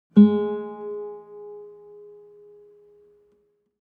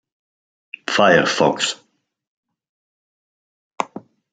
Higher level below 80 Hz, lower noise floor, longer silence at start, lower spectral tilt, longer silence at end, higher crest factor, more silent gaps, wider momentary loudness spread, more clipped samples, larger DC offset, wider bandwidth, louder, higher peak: second, -74 dBFS vs -66 dBFS; first, -66 dBFS vs -39 dBFS; second, 0.15 s vs 0.9 s; first, -11.5 dB/octave vs -3.5 dB/octave; first, 2.15 s vs 0.35 s; about the same, 20 dB vs 22 dB; second, none vs 2.27-2.43 s, 2.69-3.71 s; first, 30 LU vs 19 LU; neither; neither; second, 4 kHz vs 9.4 kHz; second, -22 LUFS vs -18 LUFS; second, -4 dBFS vs 0 dBFS